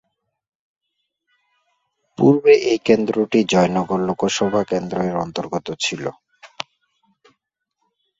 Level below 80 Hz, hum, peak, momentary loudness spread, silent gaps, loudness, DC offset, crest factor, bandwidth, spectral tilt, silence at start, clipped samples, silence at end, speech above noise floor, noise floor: -58 dBFS; none; -2 dBFS; 17 LU; none; -18 LUFS; under 0.1%; 18 dB; 8 kHz; -5.5 dB/octave; 2.2 s; under 0.1%; 1.55 s; 58 dB; -76 dBFS